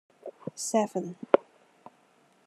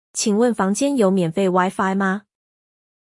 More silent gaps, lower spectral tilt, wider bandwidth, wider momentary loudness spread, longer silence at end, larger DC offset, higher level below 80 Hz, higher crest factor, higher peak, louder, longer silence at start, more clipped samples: neither; about the same, -4.5 dB/octave vs -5 dB/octave; first, 13.5 kHz vs 12 kHz; first, 16 LU vs 4 LU; first, 1.05 s vs 0.85 s; neither; second, -86 dBFS vs -64 dBFS; first, 30 dB vs 16 dB; about the same, -2 dBFS vs -4 dBFS; second, -29 LUFS vs -19 LUFS; about the same, 0.25 s vs 0.15 s; neither